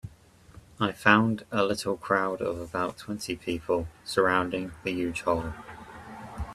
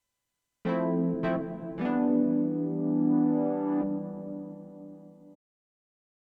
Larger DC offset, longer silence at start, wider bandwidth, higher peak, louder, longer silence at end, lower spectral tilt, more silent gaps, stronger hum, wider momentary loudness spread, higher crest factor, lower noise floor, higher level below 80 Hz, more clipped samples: neither; second, 0.05 s vs 0.65 s; first, 14.5 kHz vs 4.8 kHz; first, -2 dBFS vs -16 dBFS; about the same, -28 LUFS vs -29 LUFS; second, 0 s vs 1 s; second, -5 dB/octave vs -11 dB/octave; neither; neither; first, 20 LU vs 16 LU; first, 26 dB vs 14 dB; second, -54 dBFS vs -84 dBFS; first, -52 dBFS vs -64 dBFS; neither